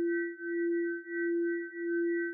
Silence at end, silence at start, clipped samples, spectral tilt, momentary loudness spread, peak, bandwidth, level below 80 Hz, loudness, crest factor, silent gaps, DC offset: 0 s; 0 s; under 0.1%; 1 dB/octave; 4 LU; -24 dBFS; 2.1 kHz; under -90 dBFS; -33 LUFS; 8 dB; none; under 0.1%